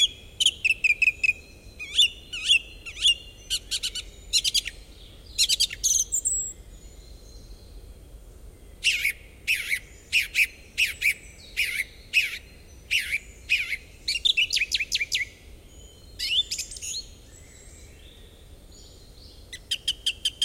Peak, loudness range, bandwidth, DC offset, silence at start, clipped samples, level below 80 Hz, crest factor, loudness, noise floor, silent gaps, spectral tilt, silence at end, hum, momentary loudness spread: -8 dBFS; 9 LU; 16.5 kHz; under 0.1%; 0 s; under 0.1%; -48 dBFS; 22 dB; -24 LUFS; -48 dBFS; none; 1.5 dB/octave; 0 s; none; 12 LU